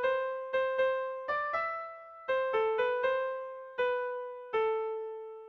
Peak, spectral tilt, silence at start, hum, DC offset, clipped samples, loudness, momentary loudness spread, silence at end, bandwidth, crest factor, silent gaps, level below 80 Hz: -20 dBFS; -4 dB/octave; 0 s; none; under 0.1%; under 0.1%; -33 LUFS; 11 LU; 0 s; 6 kHz; 14 dB; none; -72 dBFS